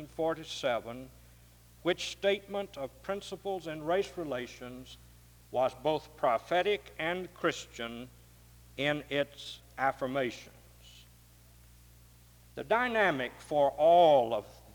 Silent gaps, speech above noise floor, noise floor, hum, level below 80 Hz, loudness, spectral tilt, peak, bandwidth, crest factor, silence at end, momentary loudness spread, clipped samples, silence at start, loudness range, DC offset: none; 27 dB; -58 dBFS; none; -60 dBFS; -31 LUFS; -4.5 dB/octave; -14 dBFS; over 20 kHz; 20 dB; 0 s; 19 LU; under 0.1%; 0 s; 8 LU; under 0.1%